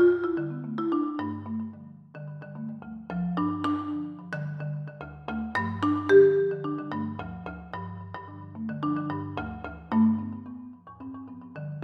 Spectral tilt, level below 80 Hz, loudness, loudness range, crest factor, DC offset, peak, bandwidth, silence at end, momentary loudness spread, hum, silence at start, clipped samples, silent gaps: -9 dB/octave; -56 dBFS; -28 LUFS; 7 LU; 20 dB; under 0.1%; -8 dBFS; 6.2 kHz; 0 s; 18 LU; none; 0 s; under 0.1%; none